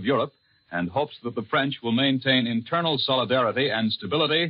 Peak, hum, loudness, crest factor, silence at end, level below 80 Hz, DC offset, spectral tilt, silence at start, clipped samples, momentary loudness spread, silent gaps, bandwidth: -8 dBFS; none; -24 LUFS; 16 dB; 0 s; -68 dBFS; under 0.1%; -3 dB/octave; 0 s; under 0.1%; 8 LU; none; 5.4 kHz